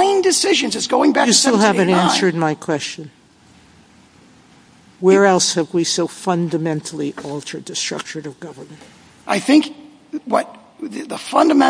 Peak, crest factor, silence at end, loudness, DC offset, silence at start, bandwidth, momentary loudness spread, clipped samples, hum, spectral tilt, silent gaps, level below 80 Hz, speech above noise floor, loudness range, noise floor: 0 dBFS; 18 dB; 0 s; -17 LUFS; under 0.1%; 0 s; 10.5 kHz; 19 LU; under 0.1%; none; -3.5 dB/octave; none; -62 dBFS; 32 dB; 7 LU; -49 dBFS